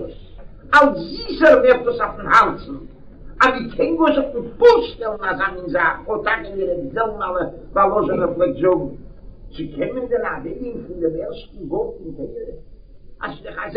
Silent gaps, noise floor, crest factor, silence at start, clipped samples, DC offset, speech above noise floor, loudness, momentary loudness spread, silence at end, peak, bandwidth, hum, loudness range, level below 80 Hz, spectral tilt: none; -39 dBFS; 20 dB; 0 s; under 0.1%; under 0.1%; 21 dB; -18 LUFS; 18 LU; 0 s; 0 dBFS; 9.2 kHz; none; 10 LU; -40 dBFS; -6 dB/octave